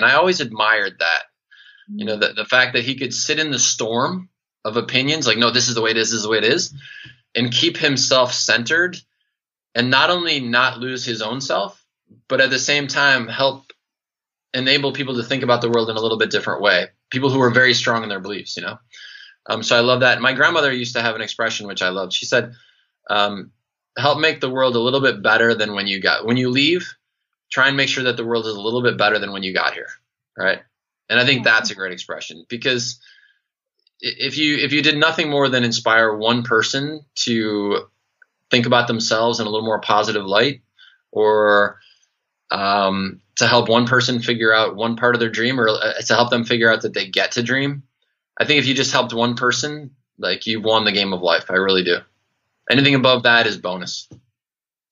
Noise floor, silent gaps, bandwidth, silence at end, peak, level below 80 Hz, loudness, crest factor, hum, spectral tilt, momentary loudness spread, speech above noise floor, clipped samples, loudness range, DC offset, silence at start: under -90 dBFS; none; 7.8 kHz; 0.75 s; 0 dBFS; -68 dBFS; -17 LUFS; 20 dB; none; -3 dB/octave; 11 LU; over 72 dB; under 0.1%; 3 LU; under 0.1%; 0 s